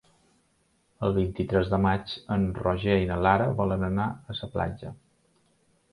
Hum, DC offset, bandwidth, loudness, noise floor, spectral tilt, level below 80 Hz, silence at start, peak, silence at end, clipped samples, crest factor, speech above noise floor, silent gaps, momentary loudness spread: none; under 0.1%; 11 kHz; -27 LUFS; -69 dBFS; -8.5 dB/octave; -44 dBFS; 1 s; -6 dBFS; 0.95 s; under 0.1%; 22 dB; 42 dB; none; 10 LU